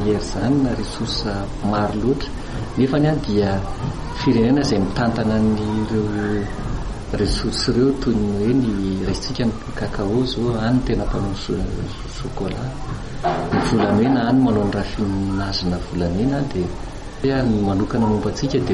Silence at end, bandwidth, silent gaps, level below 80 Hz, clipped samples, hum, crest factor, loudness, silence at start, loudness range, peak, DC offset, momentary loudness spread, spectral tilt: 0 s; 11.5 kHz; none; -32 dBFS; under 0.1%; none; 12 dB; -21 LUFS; 0 s; 3 LU; -6 dBFS; under 0.1%; 10 LU; -6.5 dB/octave